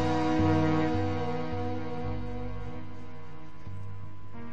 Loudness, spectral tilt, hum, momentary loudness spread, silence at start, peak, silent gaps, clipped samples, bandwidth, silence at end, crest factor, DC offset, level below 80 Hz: -30 LUFS; -7.5 dB/octave; 50 Hz at -55 dBFS; 20 LU; 0 s; -14 dBFS; none; under 0.1%; 8.2 kHz; 0 s; 16 dB; 2%; -48 dBFS